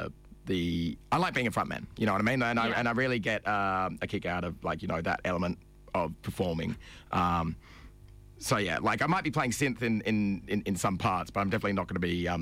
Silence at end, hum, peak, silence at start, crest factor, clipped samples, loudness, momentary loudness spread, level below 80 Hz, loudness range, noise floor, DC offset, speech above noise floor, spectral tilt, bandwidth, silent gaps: 0 s; none; -18 dBFS; 0 s; 12 dB; under 0.1%; -30 LUFS; 8 LU; -52 dBFS; 4 LU; -52 dBFS; under 0.1%; 22 dB; -5.5 dB/octave; 16 kHz; none